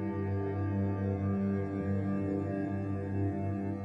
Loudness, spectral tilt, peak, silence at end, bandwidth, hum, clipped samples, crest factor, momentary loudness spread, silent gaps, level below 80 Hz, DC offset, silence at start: -34 LUFS; -11 dB/octave; -22 dBFS; 0 s; 3.8 kHz; 50 Hz at -45 dBFS; under 0.1%; 10 dB; 3 LU; none; -64 dBFS; under 0.1%; 0 s